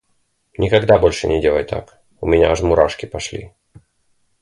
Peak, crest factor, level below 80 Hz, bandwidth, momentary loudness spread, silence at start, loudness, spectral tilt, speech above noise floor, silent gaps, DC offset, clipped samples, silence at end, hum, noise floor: 0 dBFS; 18 dB; -34 dBFS; 11.5 kHz; 15 LU; 0.6 s; -17 LUFS; -5.5 dB/octave; 49 dB; none; under 0.1%; under 0.1%; 0.95 s; none; -65 dBFS